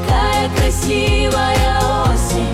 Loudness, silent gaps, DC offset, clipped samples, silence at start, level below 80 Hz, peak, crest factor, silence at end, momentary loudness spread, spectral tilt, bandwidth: -15 LUFS; none; under 0.1%; under 0.1%; 0 s; -20 dBFS; -4 dBFS; 10 dB; 0 s; 2 LU; -4.5 dB/octave; 16 kHz